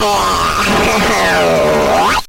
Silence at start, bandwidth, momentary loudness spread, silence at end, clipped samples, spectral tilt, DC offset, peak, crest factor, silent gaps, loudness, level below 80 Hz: 0 s; 16.5 kHz; 2 LU; 0 s; under 0.1%; -3.5 dB/octave; under 0.1%; -4 dBFS; 8 dB; none; -11 LUFS; -30 dBFS